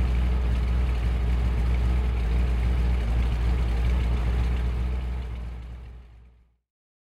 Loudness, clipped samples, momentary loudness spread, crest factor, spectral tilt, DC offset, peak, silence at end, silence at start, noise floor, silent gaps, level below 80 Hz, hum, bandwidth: -27 LUFS; under 0.1%; 10 LU; 10 dB; -7.5 dB/octave; under 0.1%; -14 dBFS; 0.95 s; 0 s; -55 dBFS; none; -26 dBFS; none; 5.4 kHz